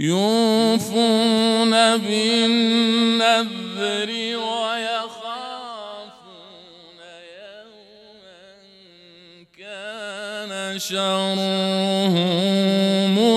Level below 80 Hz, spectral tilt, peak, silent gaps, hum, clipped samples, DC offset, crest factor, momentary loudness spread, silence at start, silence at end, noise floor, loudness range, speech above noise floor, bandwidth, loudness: -72 dBFS; -4.5 dB/octave; -6 dBFS; none; none; under 0.1%; under 0.1%; 16 dB; 16 LU; 0 s; 0 s; -49 dBFS; 21 LU; 30 dB; 14 kHz; -19 LUFS